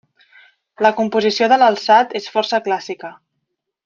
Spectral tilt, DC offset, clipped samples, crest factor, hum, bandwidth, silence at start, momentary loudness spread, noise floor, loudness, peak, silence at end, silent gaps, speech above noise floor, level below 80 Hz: -4 dB/octave; under 0.1%; under 0.1%; 16 dB; none; 7.4 kHz; 0.8 s; 14 LU; -75 dBFS; -16 LUFS; -2 dBFS; 0.7 s; none; 59 dB; -68 dBFS